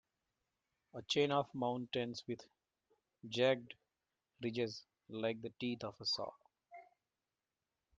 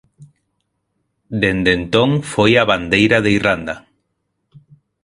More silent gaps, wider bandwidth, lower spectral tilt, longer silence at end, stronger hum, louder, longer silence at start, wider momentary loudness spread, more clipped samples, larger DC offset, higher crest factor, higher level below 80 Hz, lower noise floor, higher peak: neither; second, 9.4 kHz vs 11.5 kHz; about the same, -5 dB/octave vs -5.5 dB/octave; about the same, 1.15 s vs 1.25 s; neither; second, -40 LUFS vs -15 LUFS; first, 0.95 s vs 0.2 s; first, 23 LU vs 11 LU; neither; neither; about the same, 22 dB vs 18 dB; second, -82 dBFS vs -42 dBFS; first, under -90 dBFS vs -71 dBFS; second, -20 dBFS vs 0 dBFS